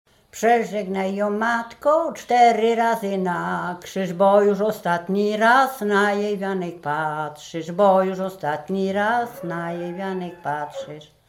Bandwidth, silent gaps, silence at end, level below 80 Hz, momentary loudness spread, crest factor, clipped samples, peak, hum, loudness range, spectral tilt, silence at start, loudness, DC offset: 17 kHz; none; 0.25 s; -66 dBFS; 12 LU; 16 dB; under 0.1%; -4 dBFS; none; 3 LU; -5.5 dB/octave; 0.35 s; -21 LUFS; under 0.1%